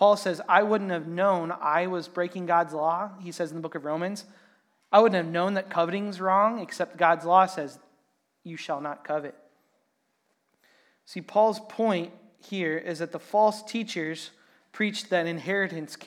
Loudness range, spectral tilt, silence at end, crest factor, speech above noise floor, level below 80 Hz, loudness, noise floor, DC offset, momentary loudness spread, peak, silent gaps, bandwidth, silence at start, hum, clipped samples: 7 LU; -5.5 dB/octave; 0 s; 22 dB; 48 dB; under -90 dBFS; -26 LUFS; -74 dBFS; under 0.1%; 13 LU; -4 dBFS; none; 14.5 kHz; 0 s; none; under 0.1%